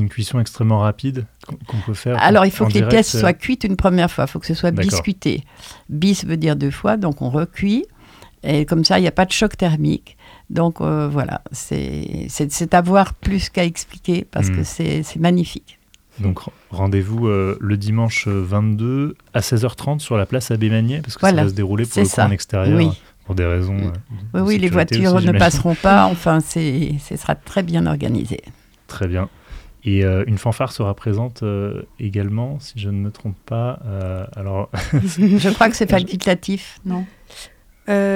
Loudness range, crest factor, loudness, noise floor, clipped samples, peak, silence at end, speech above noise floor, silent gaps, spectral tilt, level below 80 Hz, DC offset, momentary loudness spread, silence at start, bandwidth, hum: 6 LU; 18 dB; -18 LUFS; -44 dBFS; under 0.1%; 0 dBFS; 0 s; 26 dB; none; -6 dB/octave; -40 dBFS; under 0.1%; 12 LU; 0 s; 16.5 kHz; none